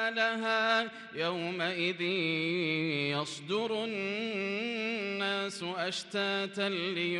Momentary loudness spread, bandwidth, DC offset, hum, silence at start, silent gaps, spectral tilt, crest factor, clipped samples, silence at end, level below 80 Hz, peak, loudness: 5 LU; 12 kHz; under 0.1%; none; 0 s; none; -4.5 dB/octave; 18 dB; under 0.1%; 0 s; -82 dBFS; -16 dBFS; -32 LUFS